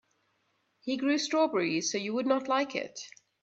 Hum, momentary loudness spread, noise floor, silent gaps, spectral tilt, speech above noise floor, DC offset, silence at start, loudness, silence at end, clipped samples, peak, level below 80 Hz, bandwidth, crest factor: none; 14 LU; -75 dBFS; none; -3 dB/octave; 45 dB; under 0.1%; 0.85 s; -29 LUFS; 0.35 s; under 0.1%; -12 dBFS; -80 dBFS; 8 kHz; 18 dB